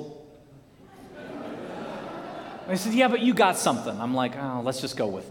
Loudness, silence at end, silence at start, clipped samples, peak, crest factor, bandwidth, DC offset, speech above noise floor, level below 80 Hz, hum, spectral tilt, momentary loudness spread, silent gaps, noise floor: -26 LUFS; 0 s; 0 s; under 0.1%; -6 dBFS; 22 dB; 18.5 kHz; under 0.1%; 27 dB; -64 dBFS; none; -4.5 dB/octave; 17 LU; none; -52 dBFS